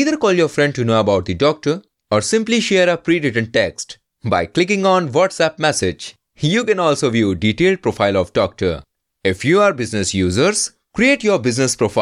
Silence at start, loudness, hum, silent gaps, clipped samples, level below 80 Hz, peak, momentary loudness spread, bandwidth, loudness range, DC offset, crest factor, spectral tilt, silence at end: 0 s; -17 LUFS; none; none; under 0.1%; -48 dBFS; -2 dBFS; 8 LU; 12.5 kHz; 1 LU; under 0.1%; 14 dB; -4.5 dB/octave; 0 s